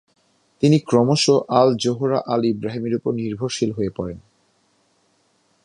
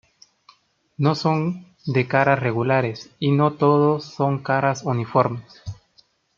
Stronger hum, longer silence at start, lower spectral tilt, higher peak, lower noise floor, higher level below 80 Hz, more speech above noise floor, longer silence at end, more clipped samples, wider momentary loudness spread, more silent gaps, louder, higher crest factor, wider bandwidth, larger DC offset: neither; second, 0.6 s vs 1 s; about the same, -6 dB/octave vs -7 dB/octave; about the same, -2 dBFS vs -2 dBFS; about the same, -63 dBFS vs -60 dBFS; first, -54 dBFS vs -60 dBFS; first, 44 dB vs 40 dB; first, 1.45 s vs 0.65 s; neither; about the same, 10 LU vs 11 LU; neither; about the same, -20 LUFS vs -21 LUFS; about the same, 18 dB vs 20 dB; first, 11 kHz vs 7.2 kHz; neither